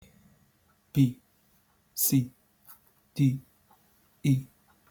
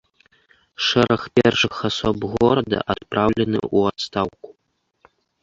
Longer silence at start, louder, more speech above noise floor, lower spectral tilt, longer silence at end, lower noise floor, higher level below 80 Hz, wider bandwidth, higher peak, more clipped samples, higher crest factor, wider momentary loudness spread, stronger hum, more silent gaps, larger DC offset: first, 0.95 s vs 0.8 s; second, -28 LUFS vs -20 LUFS; second, 42 dB vs 51 dB; about the same, -5.5 dB/octave vs -5.5 dB/octave; second, 0.45 s vs 0.9 s; second, -67 dBFS vs -71 dBFS; second, -66 dBFS vs -48 dBFS; first, over 20 kHz vs 7.8 kHz; second, -12 dBFS vs -2 dBFS; neither; about the same, 20 dB vs 20 dB; first, 16 LU vs 7 LU; neither; neither; neither